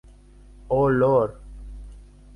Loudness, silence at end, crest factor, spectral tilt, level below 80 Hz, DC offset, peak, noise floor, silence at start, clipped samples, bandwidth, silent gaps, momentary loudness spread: -21 LUFS; 0.35 s; 18 dB; -9.5 dB/octave; -42 dBFS; under 0.1%; -8 dBFS; -48 dBFS; 0.65 s; under 0.1%; 10.5 kHz; none; 24 LU